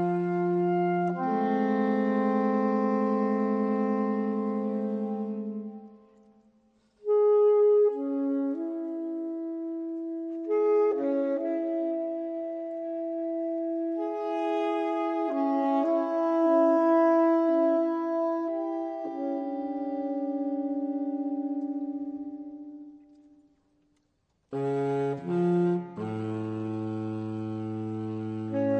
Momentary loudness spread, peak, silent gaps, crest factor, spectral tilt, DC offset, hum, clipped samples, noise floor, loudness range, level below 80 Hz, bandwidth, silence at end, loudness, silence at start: 12 LU; -14 dBFS; none; 14 dB; -9.5 dB/octave; under 0.1%; none; under 0.1%; -73 dBFS; 8 LU; -76 dBFS; 6.2 kHz; 0 s; -28 LUFS; 0 s